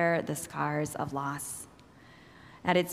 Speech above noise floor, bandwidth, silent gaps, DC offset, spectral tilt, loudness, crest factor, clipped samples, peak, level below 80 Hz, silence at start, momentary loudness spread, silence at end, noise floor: 24 dB; 16 kHz; none; under 0.1%; -4.5 dB/octave; -33 LUFS; 22 dB; under 0.1%; -10 dBFS; -64 dBFS; 0 s; 23 LU; 0 s; -55 dBFS